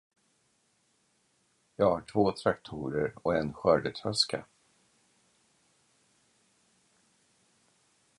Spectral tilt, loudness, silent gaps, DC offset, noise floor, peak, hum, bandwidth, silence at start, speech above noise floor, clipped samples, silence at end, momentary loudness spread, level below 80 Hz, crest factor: -5 dB/octave; -30 LUFS; none; under 0.1%; -72 dBFS; -10 dBFS; none; 11.5 kHz; 1.8 s; 43 dB; under 0.1%; 3.75 s; 8 LU; -62 dBFS; 24 dB